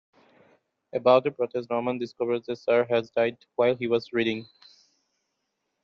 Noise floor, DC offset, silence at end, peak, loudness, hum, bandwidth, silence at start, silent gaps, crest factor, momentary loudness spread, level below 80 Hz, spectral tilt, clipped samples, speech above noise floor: -79 dBFS; under 0.1%; 1.4 s; -6 dBFS; -26 LUFS; none; 6.8 kHz; 0.95 s; none; 22 dB; 9 LU; -72 dBFS; -4 dB/octave; under 0.1%; 54 dB